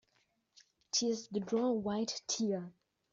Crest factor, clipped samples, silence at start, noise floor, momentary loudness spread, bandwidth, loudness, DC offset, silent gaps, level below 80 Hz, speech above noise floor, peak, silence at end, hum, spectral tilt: 18 dB; under 0.1%; 0.95 s; -77 dBFS; 5 LU; 7.6 kHz; -35 LUFS; under 0.1%; none; -76 dBFS; 42 dB; -20 dBFS; 0.4 s; none; -4.5 dB/octave